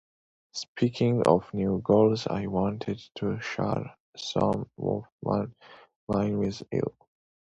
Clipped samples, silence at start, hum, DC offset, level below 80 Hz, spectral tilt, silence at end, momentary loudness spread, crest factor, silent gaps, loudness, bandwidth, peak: under 0.1%; 0.55 s; none; under 0.1%; -54 dBFS; -7 dB/octave; 0.5 s; 14 LU; 24 dB; 0.68-0.75 s, 4.00-4.13 s, 5.12-5.19 s, 5.96-6.07 s; -28 LUFS; 8.2 kHz; -4 dBFS